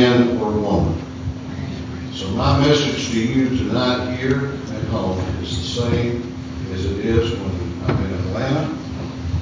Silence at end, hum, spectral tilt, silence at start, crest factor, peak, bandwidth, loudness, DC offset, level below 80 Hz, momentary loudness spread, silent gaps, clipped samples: 0 s; none; -6 dB/octave; 0 s; 18 dB; -2 dBFS; 7.6 kHz; -21 LUFS; under 0.1%; -32 dBFS; 12 LU; none; under 0.1%